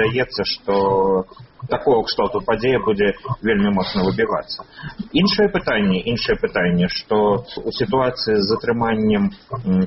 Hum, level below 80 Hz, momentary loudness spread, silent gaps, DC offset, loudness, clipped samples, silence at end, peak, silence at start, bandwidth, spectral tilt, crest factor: none; -42 dBFS; 7 LU; none; under 0.1%; -19 LUFS; under 0.1%; 0 s; -2 dBFS; 0 s; 6 kHz; -4.5 dB/octave; 16 dB